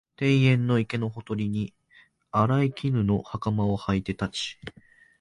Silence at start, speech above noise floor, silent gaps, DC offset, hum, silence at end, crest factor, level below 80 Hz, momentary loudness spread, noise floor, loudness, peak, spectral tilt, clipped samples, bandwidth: 0.2 s; 34 dB; none; under 0.1%; none; 0.5 s; 16 dB; -50 dBFS; 11 LU; -59 dBFS; -26 LUFS; -10 dBFS; -7 dB/octave; under 0.1%; 11 kHz